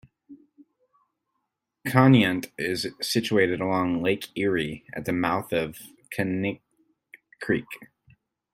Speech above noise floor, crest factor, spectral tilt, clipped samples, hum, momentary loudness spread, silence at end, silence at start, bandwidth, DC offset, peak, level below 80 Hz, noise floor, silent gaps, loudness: 56 dB; 24 dB; -6 dB/octave; under 0.1%; none; 16 LU; 0.7 s; 0.3 s; 16 kHz; under 0.1%; -2 dBFS; -60 dBFS; -80 dBFS; none; -25 LUFS